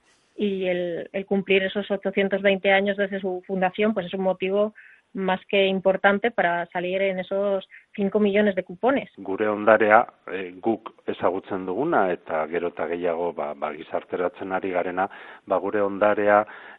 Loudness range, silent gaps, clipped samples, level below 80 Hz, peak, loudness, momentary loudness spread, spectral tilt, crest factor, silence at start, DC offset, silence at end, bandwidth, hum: 4 LU; none; under 0.1%; -66 dBFS; 0 dBFS; -24 LUFS; 10 LU; -8.5 dB/octave; 22 dB; 0.4 s; under 0.1%; 0.05 s; 4.1 kHz; none